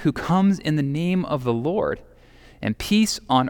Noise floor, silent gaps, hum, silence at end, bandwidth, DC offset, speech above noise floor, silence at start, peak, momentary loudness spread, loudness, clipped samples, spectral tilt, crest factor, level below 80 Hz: -49 dBFS; none; none; 0 s; 18 kHz; under 0.1%; 28 dB; 0 s; -4 dBFS; 8 LU; -22 LUFS; under 0.1%; -6 dB/octave; 18 dB; -48 dBFS